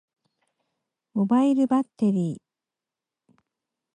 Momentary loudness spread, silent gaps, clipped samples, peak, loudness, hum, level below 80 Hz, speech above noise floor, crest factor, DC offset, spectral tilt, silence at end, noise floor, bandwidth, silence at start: 12 LU; none; under 0.1%; -12 dBFS; -23 LUFS; none; -74 dBFS; 67 dB; 16 dB; under 0.1%; -8.5 dB/octave; 1.6 s; -89 dBFS; 9.8 kHz; 1.15 s